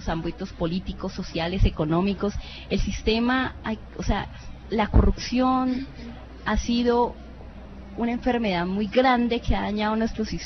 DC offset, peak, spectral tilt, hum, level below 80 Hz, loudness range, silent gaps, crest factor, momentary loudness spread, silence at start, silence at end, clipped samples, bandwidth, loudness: under 0.1%; -4 dBFS; -6 dB/octave; none; -32 dBFS; 2 LU; none; 22 dB; 16 LU; 0 s; 0 s; under 0.1%; 6.4 kHz; -25 LUFS